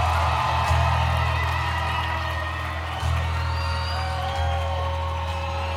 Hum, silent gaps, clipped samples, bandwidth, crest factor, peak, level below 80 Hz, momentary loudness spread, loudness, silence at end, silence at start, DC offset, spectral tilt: none; none; under 0.1%; 13.5 kHz; 16 dB; -8 dBFS; -30 dBFS; 6 LU; -25 LUFS; 0 s; 0 s; under 0.1%; -5 dB/octave